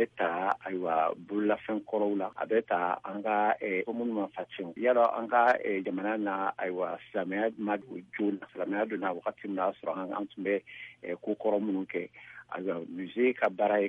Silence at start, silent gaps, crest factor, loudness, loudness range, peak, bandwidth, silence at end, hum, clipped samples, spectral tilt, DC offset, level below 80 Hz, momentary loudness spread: 0 s; none; 18 dB; -31 LUFS; 5 LU; -12 dBFS; 6.4 kHz; 0 s; none; under 0.1%; -7.5 dB/octave; under 0.1%; -78 dBFS; 11 LU